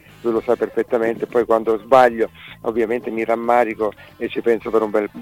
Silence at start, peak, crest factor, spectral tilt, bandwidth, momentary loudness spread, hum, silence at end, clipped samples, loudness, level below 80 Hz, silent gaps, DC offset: 0.25 s; -2 dBFS; 18 dB; -6 dB/octave; 16 kHz; 10 LU; none; 0 s; under 0.1%; -19 LUFS; -54 dBFS; none; under 0.1%